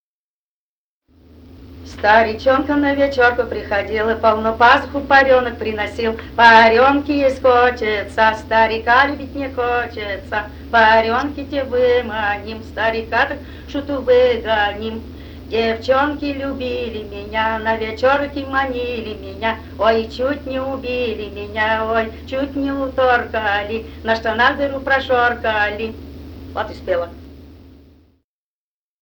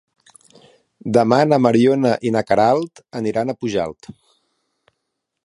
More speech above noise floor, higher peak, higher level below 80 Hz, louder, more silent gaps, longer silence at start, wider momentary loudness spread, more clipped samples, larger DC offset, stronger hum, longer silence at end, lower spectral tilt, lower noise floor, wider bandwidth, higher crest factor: first, over 73 dB vs 60 dB; about the same, 0 dBFS vs 0 dBFS; first, -38 dBFS vs -58 dBFS; about the same, -17 LUFS vs -17 LUFS; neither; first, 1.55 s vs 1.05 s; first, 14 LU vs 11 LU; neither; neither; neither; second, 1.35 s vs 1.55 s; second, -5.5 dB/octave vs -7 dB/octave; first, under -90 dBFS vs -77 dBFS; first, over 20 kHz vs 11.5 kHz; about the same, 18 dB vs 18 dB